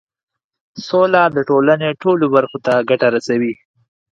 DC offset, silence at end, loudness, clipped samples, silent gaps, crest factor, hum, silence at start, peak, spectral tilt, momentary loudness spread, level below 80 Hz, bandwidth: under 0.1%; 0.65 s; -15 LUFS; under 0.1%; none; 16 dB; none; 0.75 s; 0 dBFS; -6.5 dB/octave; 6 LU; -64 dBFS; 9 kHz